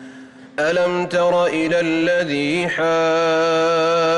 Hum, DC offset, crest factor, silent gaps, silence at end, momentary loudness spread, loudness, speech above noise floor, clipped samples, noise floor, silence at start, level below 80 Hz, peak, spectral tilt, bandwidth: none; under 0.1%; 8 dB; none; 0 s; 3 LU; -18 LUFS; 22 dB; under 0.1%; -40 dBFS; 0 s; -58 dBFS; -10 dBFS; -5 dB/octave; 11 kHz